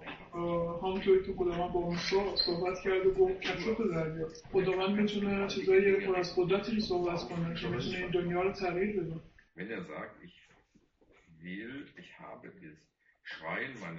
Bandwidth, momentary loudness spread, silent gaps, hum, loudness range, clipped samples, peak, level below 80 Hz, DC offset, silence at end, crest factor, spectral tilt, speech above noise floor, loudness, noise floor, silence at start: 7 kHz; 18 LU; none; none; 16 LU; under 0.1%; -16 dBFS; -56 dBFS; under 0.1%; 0 s; 18 dB; -4 dB/octave; 36 dB; -32 LUFS; -68 dBFS; 0 s